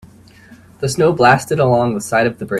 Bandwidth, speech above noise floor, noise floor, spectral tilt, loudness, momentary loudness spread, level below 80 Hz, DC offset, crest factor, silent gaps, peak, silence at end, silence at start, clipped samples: 14.5 kHz; 29 dB; -43 dBFS; -5.5 dB/octave; -15 LUFS; 7 LU; -48 dBFS; under 0.1%; 16 dB; none; 0 dBFS; 0 s; 0.8 s; under 0.1%